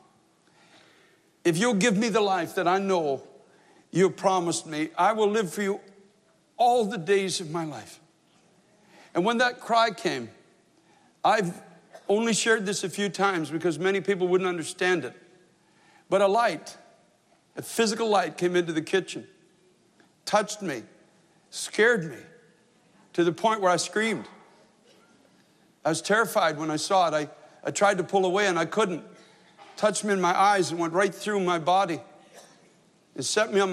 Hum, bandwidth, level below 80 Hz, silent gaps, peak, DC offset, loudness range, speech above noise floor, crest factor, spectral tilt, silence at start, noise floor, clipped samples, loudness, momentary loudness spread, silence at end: none; 14 kHz; -80 dBFS; none; -10 dBFS; under 0.1%; 4 LU; 39 dB; 18 dB; -4 dB/octave; 1.45 s; -63 dBFS; under 0.1%; -25 LUFS; 13 LU; 0 s